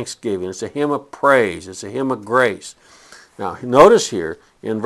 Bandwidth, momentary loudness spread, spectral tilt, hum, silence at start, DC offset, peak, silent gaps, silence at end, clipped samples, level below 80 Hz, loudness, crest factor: 12.5 kHz; 18 LU; -4.5 dB/octave; none; 0 s; under 0.1%; 0 dBFS; none; 0 s; 0.2%; -52 dBFS; -17 LUFS; 18 dB